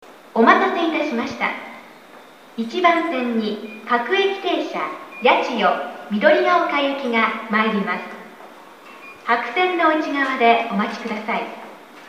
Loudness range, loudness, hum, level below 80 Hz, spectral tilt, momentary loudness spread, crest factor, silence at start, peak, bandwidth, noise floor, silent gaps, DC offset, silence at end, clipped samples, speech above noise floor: 3 LU; -19 LUFS; none; -70 dBFS; -5 dB/octave; 16 LU; 20 dB; 0.05 s; 0 dBFS; 15.5 kHz; -44 dBFS; none; under 0.1%; 0 s; under 0.1%; 24 dB